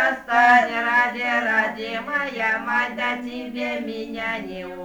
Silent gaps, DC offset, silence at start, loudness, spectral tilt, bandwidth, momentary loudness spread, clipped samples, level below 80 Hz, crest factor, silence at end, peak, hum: none; under 0.1%; 0 s; -21 LUFS; -4 dB/octave; over 20 kHz; 13 LU; under 0.1%; -58 dBFS; 18 dB; 0 s; -4 dBFS; none